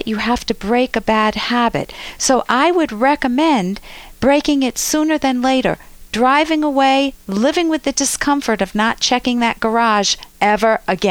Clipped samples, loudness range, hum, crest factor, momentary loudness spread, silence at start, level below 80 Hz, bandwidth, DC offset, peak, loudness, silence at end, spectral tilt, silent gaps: under 0.1%; 1 LU; none; 14 dB; 5 LU; 0 s; -42 dBFS; over 20 kHz; under 0.1%; -2 dBFS; -16 LUFS; 0 s; -3 dB/octave; none